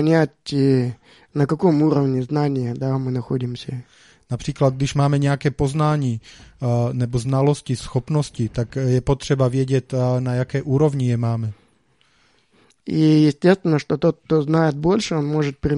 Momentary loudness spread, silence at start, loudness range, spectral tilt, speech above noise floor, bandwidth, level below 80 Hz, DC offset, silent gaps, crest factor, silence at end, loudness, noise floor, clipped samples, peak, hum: 9 LU; 0 s; 3 LU; -7.5 dB/octave; 42 dB; 11 kHz; -44 dBFS; under 0.1%; none; 18 dB; 0 s; -20 LUFS; -61 dBFS; under 0.1%; 0 dBFS; none